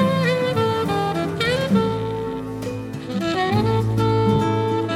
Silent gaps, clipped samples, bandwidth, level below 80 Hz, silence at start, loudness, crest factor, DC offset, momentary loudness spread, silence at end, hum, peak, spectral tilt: none; under 0.1%; 15 kHz; -44 dBFS; 0 s; -21 LUFS; 14 dB; under 0.1%; 9 LU; 0 s; none; -6 dBFS; -6.5 dB/octave